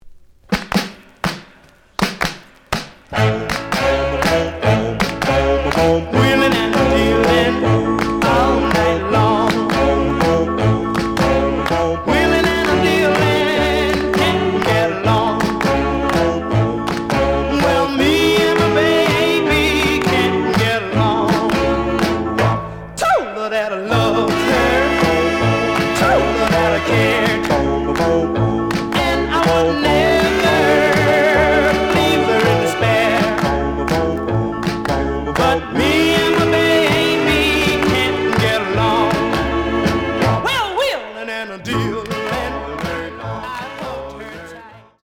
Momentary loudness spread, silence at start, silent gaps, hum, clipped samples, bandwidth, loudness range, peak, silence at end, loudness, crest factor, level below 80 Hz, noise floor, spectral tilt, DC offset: 9 LU; 0.05 s; none; none; under 0.1%; 18 kHz; 5 LU; -2 dBFS; 0.25 s; -16 LUFS; 14 dB; -32 dBFS; -48 dBFS; -5.5 dB/octave; under 0.1%